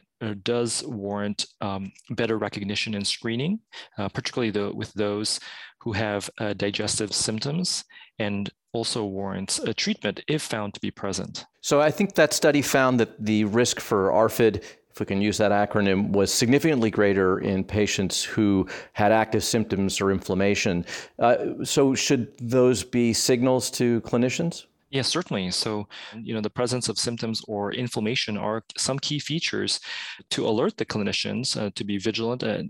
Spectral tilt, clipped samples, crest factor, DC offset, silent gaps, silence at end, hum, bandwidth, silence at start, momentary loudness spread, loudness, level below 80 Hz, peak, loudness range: -4 dB/octave; under 0.1%; 20 dB; under 0.1%; none; 0 s; none; 17 kHz; 0.2 s; 10 LU; -25 LUFS; -58 dBFS; -6 dBFS; 6 LU